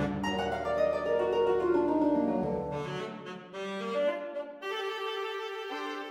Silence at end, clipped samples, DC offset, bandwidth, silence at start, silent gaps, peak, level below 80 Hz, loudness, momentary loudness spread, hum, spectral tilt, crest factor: 0 s; under 0.1%; under 0.1%; 15.5 kHz; 0 s; none; -16 dBFS; -56 dBFS; -31 LUFS; 11 LU; none; -6 dB/octave; 14 dB